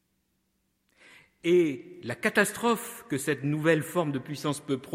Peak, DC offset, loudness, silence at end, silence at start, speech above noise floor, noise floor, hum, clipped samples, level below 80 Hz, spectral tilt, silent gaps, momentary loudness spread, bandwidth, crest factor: -8 dBFS; under 0.1%; -28 LUFS; 0 s; 1.45 s; 47 dB; -75 dBFS; none; under 0.1%; -70 dBFS; -5 dB/octave; none; 9 LU; 16 kHz; 20 dB